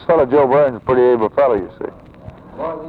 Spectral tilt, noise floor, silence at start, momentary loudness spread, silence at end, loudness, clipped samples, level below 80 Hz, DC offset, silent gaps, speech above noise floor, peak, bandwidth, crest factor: -9.5 dB/octave; -38 dBFS; 0 s; 16 LU; 0 s; -14 LUFS; under 0.1%; -46 dBFS; under 0.1%; none; 23 dB; -4 dBFS; 4.7 kHz; 12 dB